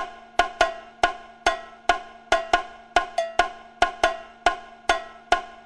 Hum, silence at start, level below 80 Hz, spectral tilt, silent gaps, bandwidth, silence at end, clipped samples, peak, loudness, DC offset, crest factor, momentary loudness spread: none; 0 s; -44 dBFS; -2 dB/octave; none; 12 kHz; 0.1 s; under 0.1%; -4 dBFS; -25 LUFS; under 0.1%; 22 dB; 5 LU